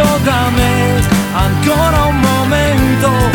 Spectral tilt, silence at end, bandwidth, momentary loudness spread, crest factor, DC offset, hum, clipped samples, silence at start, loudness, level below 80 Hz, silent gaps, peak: -5.5 dB/octave; 0 s; 19 kHz; 2 LU; 10 dB; under 0.1%; none; under 0.1%; 0 s; -12 LUFS; -22 dBFS; none; -2 dBFS